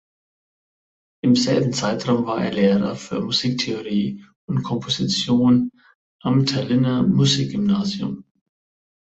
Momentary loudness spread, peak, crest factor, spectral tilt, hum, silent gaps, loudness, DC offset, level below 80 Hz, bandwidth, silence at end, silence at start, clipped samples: 10 LU; -6 dBFS; 16 dB; -5.5 dB/octave; none; 4.36-4.48 s, 5.95-6.19 s; -20 LUFS; under 0.1%; -56 dBFS; 8.2 kHz; 1 s; 1.25 s; under 0.1%